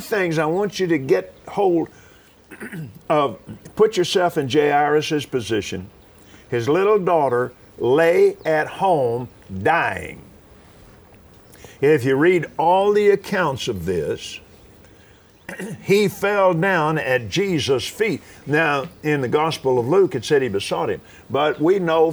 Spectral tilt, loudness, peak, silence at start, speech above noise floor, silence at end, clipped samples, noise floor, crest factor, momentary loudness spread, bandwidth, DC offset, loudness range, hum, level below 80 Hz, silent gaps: -5.5 dB/octave; -19 LUFS; -4 dBFS; 0 s; 31 dB; 0 s; under 0.1%; -50 dBFS; 16 dB; 14 LU; over 20 kHz; under 0.1%; 4 LU; none; -54 dBFS; none